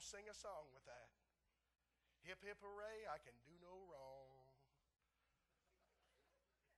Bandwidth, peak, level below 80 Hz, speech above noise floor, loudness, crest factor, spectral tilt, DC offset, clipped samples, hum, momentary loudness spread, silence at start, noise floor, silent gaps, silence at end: 12 kHz; -40 dBFS; -82 dBFS; 31 dB; -58 LUFS; 22 dB; -2.5 dB/octave; under 0.1%; under 0.1%; none; 11 LU; 0 s; -89 dBFS; none; 0 s